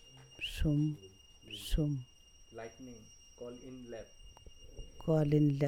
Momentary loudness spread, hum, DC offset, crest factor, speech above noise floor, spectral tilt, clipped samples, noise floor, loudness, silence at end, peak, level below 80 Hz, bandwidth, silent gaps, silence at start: 25 LU; none; under 0.1%; 18 dB; 20 dB; -7 dB/octave; under 0.1%; -54 dBFS; -35 LUFS; 0 s; -18 dBFS; -48 dBFS; 15 kHz; none; 0.05 s